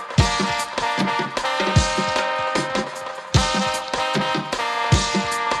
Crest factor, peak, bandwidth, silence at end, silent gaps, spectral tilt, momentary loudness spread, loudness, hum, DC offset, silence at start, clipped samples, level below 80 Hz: 18 dB; -4 dBFS; 14 kHz; 0 s; none; -4 dB/octave; 4 LU; -21 LUFS; none; under 0.1%; 0 s; under 0.1%; -34 dBFS